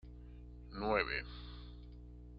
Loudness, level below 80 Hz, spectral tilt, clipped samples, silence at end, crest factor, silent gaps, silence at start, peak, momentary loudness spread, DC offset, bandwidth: -39 LUFS; -52 dBFS; -3 dB/octave; under 0.1%; 0 s; 24 dB; none; 0.05 s; -18 dBFS; 20 LU; under 0.1%; 5.6 kHz